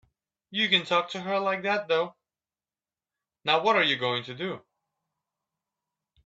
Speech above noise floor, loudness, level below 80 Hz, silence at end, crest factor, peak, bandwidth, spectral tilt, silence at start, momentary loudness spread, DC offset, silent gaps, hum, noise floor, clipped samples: over 64 dB; -26 LUFS; -76 dBFS; 1.7 s; 24 dB; -6 dBFS; 8 kHz; -4 dB/octave; 0.5 s; 12 LU; under 0.1%; none; none; under -90 dBFS; under 0.1%